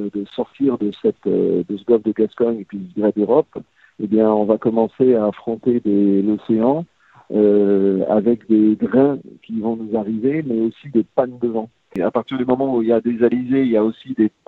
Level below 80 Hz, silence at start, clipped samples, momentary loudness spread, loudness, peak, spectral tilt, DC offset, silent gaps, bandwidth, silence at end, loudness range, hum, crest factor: -58 dBFS; 0 s; under 0.1%; 9 LU; -18 LUFS; -2 dBFS; -10.5 dB/octave; under 0.1%; none; 4.2 kHz; 0.2 s; 3 LU; none; 16 dB